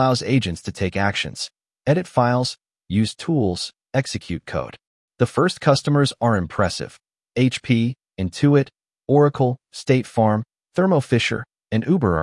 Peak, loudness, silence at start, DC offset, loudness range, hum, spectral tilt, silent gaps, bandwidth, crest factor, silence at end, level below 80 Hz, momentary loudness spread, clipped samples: -4 dBFS; -21 LUFS; 0 s; under 0.1%; 3 LU; none; -6 dB/octave; 4.87-5.08 s; 12 kHz; 18 dB; 0 s; -52 dBFS; 11 LU; under 0.1%